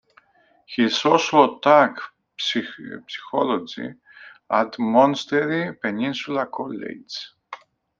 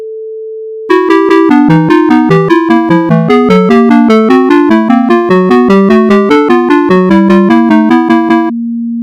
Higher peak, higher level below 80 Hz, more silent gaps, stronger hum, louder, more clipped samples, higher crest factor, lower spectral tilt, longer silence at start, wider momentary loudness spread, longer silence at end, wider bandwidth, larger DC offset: about the same, -2 dBFS vs 0 dBFS; second, -70 dBFS vs -42 dBFS; neither; neither; second, -21 LUFS vs -6 LUFS; second, under 0.1% vs 8%; first, 20 dB vs 6 dB; second, -4.5 dB/octave vs -8 dB/octave; first, 0.7 s vs 0 s; first, 19 LU vs 6 LU; first, 0.45 s vs 0 s; second, 7.6 kHz vs 9.4 kHz; neither